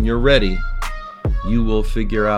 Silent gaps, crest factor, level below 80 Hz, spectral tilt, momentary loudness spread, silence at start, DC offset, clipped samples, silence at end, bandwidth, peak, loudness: none; 16 dB; -20 dBFS; -6.5 dB/octave; 12 LU; 0 s; under 0.1%; under 0.1%; 0 s; 11.5 kHz; 0 dBFS; -20 LUFS